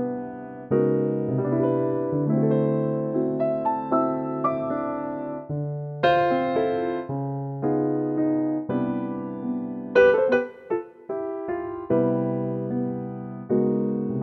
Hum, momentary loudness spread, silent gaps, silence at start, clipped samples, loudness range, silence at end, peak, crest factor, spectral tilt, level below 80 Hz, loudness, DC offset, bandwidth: none; 9 LU; none; 0 s; under 0.1%; 3 LU; 0 s; -6 dBFS; 18 dB; -9.5 dB/octave; -60 dBFS; -25 LUFS; under 0.1%; 6 kHz